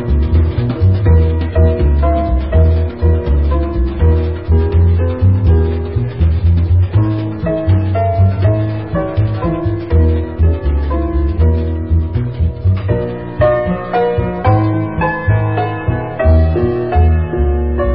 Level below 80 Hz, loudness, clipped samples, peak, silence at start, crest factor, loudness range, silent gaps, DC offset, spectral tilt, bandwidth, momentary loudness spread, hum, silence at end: -16 dBFS; -14 LUFS; under 0.1%; 0 dBFS; 0 s; 12 dB; 2 LU; none; 0.9%; -14 dB/octave; 4.9 kHz; 5 LU; none; 0 s